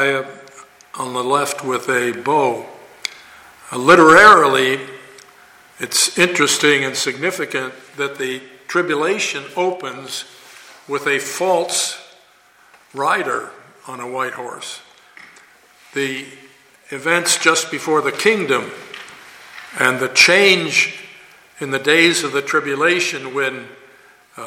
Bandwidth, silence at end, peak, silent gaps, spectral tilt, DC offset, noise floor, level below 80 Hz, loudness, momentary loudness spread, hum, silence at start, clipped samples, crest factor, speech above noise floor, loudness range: 17 kHz; 0 s; 0 dBFS; none; -2.5 dB/octave; under 0.1%; -51 dBFS; -60 dBFS; -16 LUFS; 21 LU; none; 0 s; under 0.1%; 18 dB; 35 dB; 12 LU